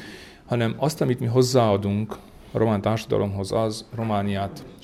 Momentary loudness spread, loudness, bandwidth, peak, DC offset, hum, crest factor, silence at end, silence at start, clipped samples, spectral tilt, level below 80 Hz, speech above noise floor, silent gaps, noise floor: 13 LU; -24 LUFS; 15 kHz; -6 dBFS; under 0.1%; none; 18 dB; 0.1 s; 0 s; under 0.1%; -6.5 dB/octave; -52 dBFS; 19 dB; none; -42 dBFS